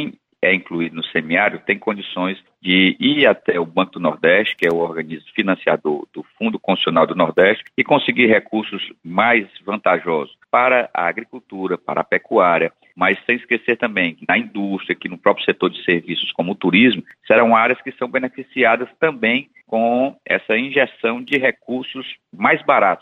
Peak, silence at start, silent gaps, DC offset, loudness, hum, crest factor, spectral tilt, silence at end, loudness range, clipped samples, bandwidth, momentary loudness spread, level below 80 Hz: -2 dBFS; 0 s; none; under 0.1%; -18 LUFS; none; 16 dB; -7 dB/octave; 0.05 s; 2 LU; under 0.1%; 5.8 kHz; 10 LU; -66 dBFS